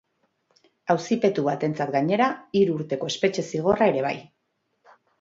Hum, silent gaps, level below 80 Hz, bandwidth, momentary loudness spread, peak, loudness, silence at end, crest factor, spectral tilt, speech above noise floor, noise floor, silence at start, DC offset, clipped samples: none; none; -64 dBFS; 7.8 kHz; 7 LU; -6 dBFS; -24 LUFS; 0.95 s; 18 dB; -6 dB/octave; 51 dB; -74 dBFS; 0.85 s; under 0.1%; under 0.1%